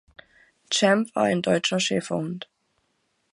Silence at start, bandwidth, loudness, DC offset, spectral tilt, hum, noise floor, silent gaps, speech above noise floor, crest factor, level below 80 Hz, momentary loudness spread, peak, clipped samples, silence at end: 0.7 s; 11.5 kHz; -23 LUFS; under 0.1%; -4 dB/octave; none; -72 dBFS; none; 49 dB; 20 dB; -68 dBFS; 13 LU; -6 dBFS; under 0.1%; 0.9 s